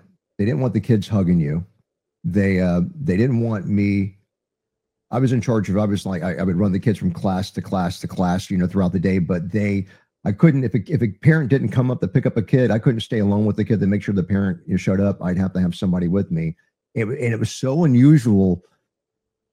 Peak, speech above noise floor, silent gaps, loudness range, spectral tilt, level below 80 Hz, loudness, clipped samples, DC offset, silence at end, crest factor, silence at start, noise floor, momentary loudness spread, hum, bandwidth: -2 dBFS; 63 dB; none; 3 LU; -8 dB/octave; -50 dBFS; -20 LUFS; under 0.1%; under 0.1%; 0.95 s; 18 dB; 0.4 s; -82 dBFS; 8 LU; none; 12 kHz